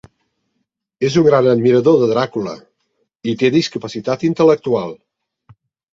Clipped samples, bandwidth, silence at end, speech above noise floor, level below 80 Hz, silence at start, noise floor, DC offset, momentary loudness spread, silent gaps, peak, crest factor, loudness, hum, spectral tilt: under 0.1%; 7.6 kHz; 1 s; 57 dB; -56 dBFS; 1 s; -72 dBFS; under 0.1%; 13 LU; none; 0 dBFS; 16 dB; -15 LUFS; none; -6.5 dB/octave